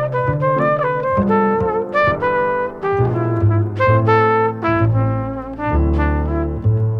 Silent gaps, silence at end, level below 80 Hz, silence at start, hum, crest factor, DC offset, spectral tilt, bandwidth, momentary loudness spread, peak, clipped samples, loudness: none; 0 s; -28 dBFS; 0 s; none; 14 dB; under 0.1%; -9.5 dB/octave; 5.6 kHz; 6 LU; -2 dBFS; under 0.1%; -17 LUFS